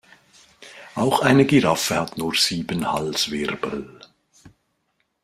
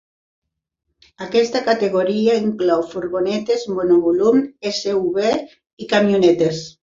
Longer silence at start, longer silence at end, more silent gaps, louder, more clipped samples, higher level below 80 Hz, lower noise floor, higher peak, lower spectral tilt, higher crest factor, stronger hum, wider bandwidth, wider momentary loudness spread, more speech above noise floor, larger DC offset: second, 0.6 s vs 1.2 s; first, 0.75 s vs 0.15 s; second, none vs 5.73-5.77 s; about the same, -20 LUFS vs -18 LUFS; neither; about the same, -56 dBFS vs -58 dBFS; second, -71 dBFS vs -76 dBFS; about the same, -2 dBFS vs -2 dBFS; second, -4 dB/octave vs -5.5 dB/octave; about the same, 20 dB vs 16 dB; neither; first, 16 kHz vs 7.6 kHz; first, 16 LU vs 8 LU; second, 51 dB vs 58 dB; neither